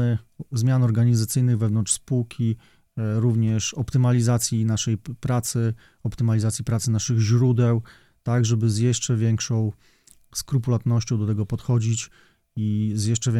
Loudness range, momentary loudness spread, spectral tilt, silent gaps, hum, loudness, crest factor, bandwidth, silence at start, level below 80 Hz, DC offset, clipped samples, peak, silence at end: 3 LU; 10 LU; -6 dB/octave; none; none; -23 LUFS; 14 dB; 14 kHz; 0 s; -52 dBFS; under 0.1%; under 0.1%; -8 dBFS; 0 s